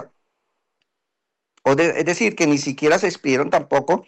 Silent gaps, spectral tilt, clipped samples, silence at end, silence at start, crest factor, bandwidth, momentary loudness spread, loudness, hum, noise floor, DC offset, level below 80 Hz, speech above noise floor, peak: none; -4.5 dB/octave; under 0.1%; 0.05 s; 0 s; 16 dB; 10.5 kHz; 3 LU; -19 LUFS; none; -81 dBFS; under 0.1%; -62 dBFS; 62 dB; -4 dBFS